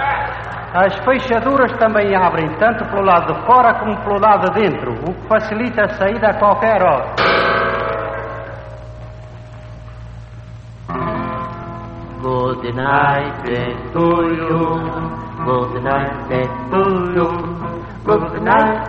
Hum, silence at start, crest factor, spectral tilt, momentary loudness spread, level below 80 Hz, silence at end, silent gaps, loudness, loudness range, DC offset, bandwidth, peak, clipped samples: none; 0 s; 16 dB; -8 dB/octave; 20 LU; -38 dBFS; 0 s; none; -16 LUFS; 13 LU; under 0.1%; 7.4 kHz; -2 dBFS; under 0.1%